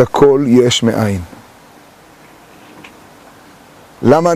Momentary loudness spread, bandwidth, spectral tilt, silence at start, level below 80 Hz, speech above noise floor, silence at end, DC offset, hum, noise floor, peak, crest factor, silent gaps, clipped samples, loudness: 12 LU; 15.5 kHz; -5.5 dB/octave; 0 s; -46 dBFS; 31 dB; 0 s; under 0.1%; none; -42 dBFS; 0 dBFS; 14 dB; none; under 0.1%; -12 LUFS